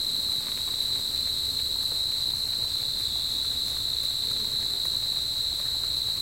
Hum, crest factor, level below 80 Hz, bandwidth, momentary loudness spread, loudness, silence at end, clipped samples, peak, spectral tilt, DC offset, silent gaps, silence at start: none; 12 dB; -50 dBFS; 16.5 kHz; 1 LU; -25 LUFS; 0 s; under 0.1%; -16 dBFS; -0.5 dB/octave; 0.2%; none; 0 s